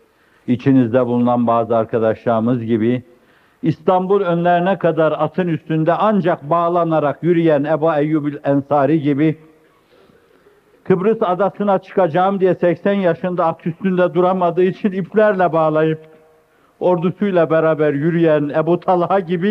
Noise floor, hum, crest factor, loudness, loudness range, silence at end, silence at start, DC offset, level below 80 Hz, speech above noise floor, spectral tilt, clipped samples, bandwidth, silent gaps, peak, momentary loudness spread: -54 dBFS; none; 16 dB; -16 LUFS; 3 LU; 0 s; 0.45 s; under 0.1%; -62 dBFS; 38 dB; -9.5 dB/octave; under 0.1%; 5.8 kHz; none; 0 dBFS; 5 LU